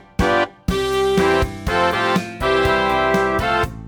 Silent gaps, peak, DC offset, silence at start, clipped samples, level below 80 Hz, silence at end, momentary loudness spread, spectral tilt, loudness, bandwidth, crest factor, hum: none; -4 dBFS; under 0.1%; 0.2 s; under 0.1%; -32 dBFS; 0 s; 4 LU; -5 dB/octave; -18 LUFS; over 20 kHz; 14 dB; none